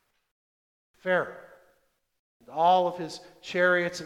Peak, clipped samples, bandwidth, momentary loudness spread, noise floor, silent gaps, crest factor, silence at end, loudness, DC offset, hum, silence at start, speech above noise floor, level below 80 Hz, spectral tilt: -10 dBFS; under 0.1%; 13 kHz; 16 LU; -71 dBFS; 2.19-2.40 s; 18 dB; 0 s; -26 LUFS; under 0.1%; none; 1.05 s; 45 dB; -74 dBFS; -4.5 dB/octave